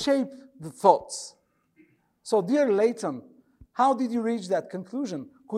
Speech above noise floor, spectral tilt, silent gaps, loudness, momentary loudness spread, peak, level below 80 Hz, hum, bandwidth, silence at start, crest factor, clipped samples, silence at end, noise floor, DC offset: 37 dB; -5 dB/octave; none; -26 LUFS; 19 LU; -4 dBFS; -68 dBFS; none; 13 kHz; 0 s; 22 dB; under 0.1%; 0 s; -62 dBFS; under 0.1%